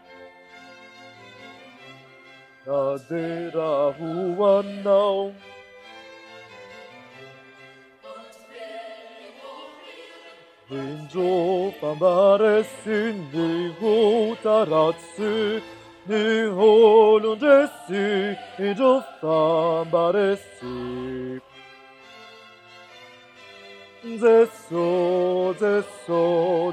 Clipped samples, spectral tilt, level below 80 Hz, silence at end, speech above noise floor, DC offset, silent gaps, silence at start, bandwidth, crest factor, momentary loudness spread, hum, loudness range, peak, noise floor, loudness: under 0.1%; -6 dB/octave; -68 dBFS; 0 s; 29 dB; under 0.1%; none; 0.2 s; 10.5 kHz; 18 dB; 25 LU; none; 21 LU; -4 dBFS; -49 dBFS; -21 LUFS